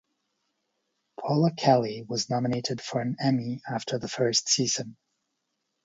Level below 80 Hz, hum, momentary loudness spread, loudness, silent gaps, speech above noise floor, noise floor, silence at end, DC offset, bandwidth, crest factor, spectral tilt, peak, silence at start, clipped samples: -68 dBFS; none; 9 LU; -27 LUFS; none; 53 dB; -80 dBFS; 0.9 s; under 0.1%; 8 kHz; 22 dB; -4.5 dB/octave; -6 dBFS; 1.2 s; under 0.1%